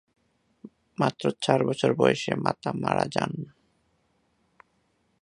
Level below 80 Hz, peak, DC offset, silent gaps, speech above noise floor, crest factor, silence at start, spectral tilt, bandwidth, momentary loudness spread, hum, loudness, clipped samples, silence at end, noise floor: -64 dBFS; -4 dBFS; under 0.1%; none; 45 dB; 26 dB; 0.65 s; -5.5 dB/octave; 11 kHz; 11 LU; none; -26 LUFS; under 0.1%; 1.75 s; -70 dBFS